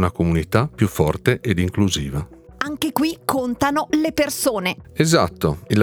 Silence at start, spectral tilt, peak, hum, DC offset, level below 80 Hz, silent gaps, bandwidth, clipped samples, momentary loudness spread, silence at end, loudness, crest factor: 0 s; -5.5 dB/octave; 0 dBFS; none; under 0.1%; -40 dBFS; none; 20 kHz; under 0.1%; 7 LU; 0 s; -20 LUFS; 20 dB